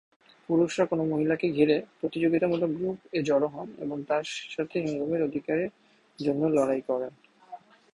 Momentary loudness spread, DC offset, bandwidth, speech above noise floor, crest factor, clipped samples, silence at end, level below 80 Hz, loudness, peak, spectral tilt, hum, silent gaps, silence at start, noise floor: 11 LU; under 0.1%; 11.5 kHz; 21 dB; 18 dB; under 0.1%; 0.35 s; -68 dBFS; -28 LUFS; -10 dBFS; -6.5 dB/octave; none; none; 0.5 s; -48 dBFS